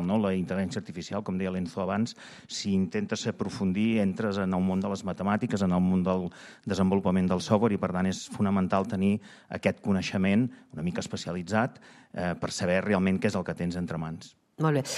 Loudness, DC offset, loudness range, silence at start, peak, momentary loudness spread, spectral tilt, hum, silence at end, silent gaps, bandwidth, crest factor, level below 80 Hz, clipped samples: -29 LUFS; under 0.1%; 3 LU; 0 s; -10 dBFS; 9 LU; -6.5 dB/octave; none; 0 s; none; 11.5 kHz; 18 dB; -60 dBFS; under 0.1%